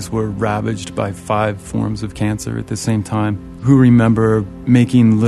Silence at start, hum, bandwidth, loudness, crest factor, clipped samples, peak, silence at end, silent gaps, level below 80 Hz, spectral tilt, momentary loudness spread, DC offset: 0 s; none; 12.5 kHz; -16 LUFS; 14 dB; under 0.1%; 0 dBFS; 0 s; none; -40 dBFS; -7 dB/octave; 11 LU; under 0.1%